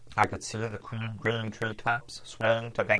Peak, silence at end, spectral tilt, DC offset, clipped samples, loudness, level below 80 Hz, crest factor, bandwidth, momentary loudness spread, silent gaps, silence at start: -8 dBFS; 0 s; -5 dB/octave; under 0.1%; under 0.1%; -31 LUFS; -58 dBFS; 22 dB; 11 kHz; 8 LU; none; 0 s